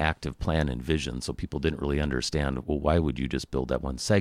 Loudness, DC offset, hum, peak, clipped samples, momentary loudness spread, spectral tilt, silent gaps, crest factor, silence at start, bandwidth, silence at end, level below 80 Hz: -29 LUFS; under 0.1%; none; -8 dBFS; under 0.1%; 6 LU; -5.5 dB/octave; none; 20 dB; 0 s; 14 kHz; 0 s; -36 dBFS